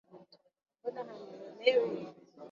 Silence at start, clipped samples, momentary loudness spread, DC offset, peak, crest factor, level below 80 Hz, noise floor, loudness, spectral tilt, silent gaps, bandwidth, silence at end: 0.15 s; under 0.1%; 20 LU; under 0.1%; -12 dBFS; 24 dB; -86 dBFS; -59 dBFS; -34 LUFS; -1.5 dB/octave; none; 7.2 kHz; 0 s